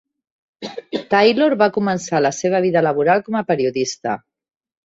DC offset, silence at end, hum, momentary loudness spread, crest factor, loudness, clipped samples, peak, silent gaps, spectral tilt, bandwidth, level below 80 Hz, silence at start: under 0.1%; 0.7 s; none; 13 LU; 18 dB; -18 LUFS; under 0.1%; -2 dBFS; none; -5 dB/octave; 8 kHz; -62 dBFS; 0.6 s